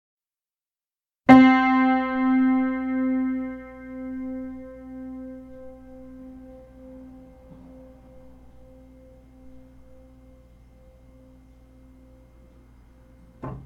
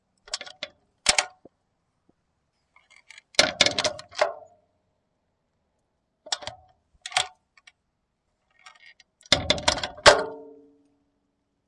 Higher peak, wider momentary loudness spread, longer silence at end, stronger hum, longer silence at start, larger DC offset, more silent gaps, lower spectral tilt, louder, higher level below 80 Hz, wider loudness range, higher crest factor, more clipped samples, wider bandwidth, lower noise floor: about the same, 0 dBFS vs 0 dBFS; first, 30 LU vs 22 LU; second, 0.05 s vs 1.2 s; neither; first, 1.3 s vs 0.3 s; neither; neither; first, -7 dB/octave vs -1 dB/octave; first, -20 LUFS vs -23 LUFS; about the same, -52 dBFS vs -54 dBFS; first, 26 LU vs 10 LU; about the same, 26 dB vs 30 dB; neither; second, 4.9 kHz vs 11.5 kHz; first, under -90 dBFS vs -76 dBFS